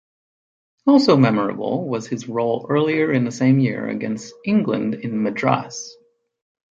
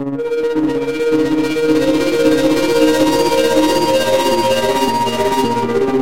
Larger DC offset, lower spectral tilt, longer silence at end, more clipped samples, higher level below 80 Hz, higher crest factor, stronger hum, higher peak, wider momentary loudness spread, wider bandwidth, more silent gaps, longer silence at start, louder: second, under 0.1% vs 3%; first, -6.5 dB/octave vs -4.5 dB/octave; first, 0.9 s vs 0 s; neither; second, -64 dBFS vs -44 dBFS; first, 18 dB vs 12 dB; neither; about the same, -2 dBFS vs -2 dBFS; first, 11 LU vs 4 LU; second, 7.8 kHz vs 16 kHz; neither; first, 0.85 s vs 0 s; second, -20 LUFS vs -14 LUFS